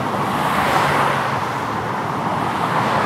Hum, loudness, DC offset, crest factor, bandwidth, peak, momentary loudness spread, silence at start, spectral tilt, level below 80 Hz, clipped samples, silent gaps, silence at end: none; -19 LUFS; under 0.1%; 16 dB; 16 kHz; -2 dBFS; 6 LU; 0 s; -5 dB/octave; -48 dBFS; under 0.1%; none; 0 s